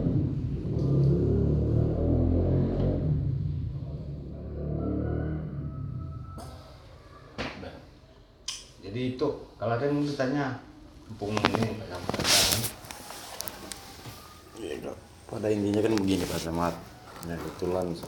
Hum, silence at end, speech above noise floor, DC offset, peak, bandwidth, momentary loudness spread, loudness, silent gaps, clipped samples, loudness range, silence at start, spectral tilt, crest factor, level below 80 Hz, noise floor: none; 0 s; 25 dB; under 0.1%; 0 dBFS; over 20 kHz; 17 LU; -29 LUFS; none; under 0.1%; 10 LU; 0 s; -5 dB/octave; 28 dB; -42 dBFS; -54 dBFS